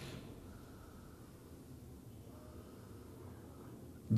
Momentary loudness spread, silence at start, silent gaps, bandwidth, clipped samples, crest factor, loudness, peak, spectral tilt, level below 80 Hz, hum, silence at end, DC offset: 3 LU; 0 s; none; 14.5 kHz; under 0.1%; 24 dB; -55 LUFS; -22 dBFS; -7.5 dB/octave; -62 dBFS; none; 0 s; under 0.1%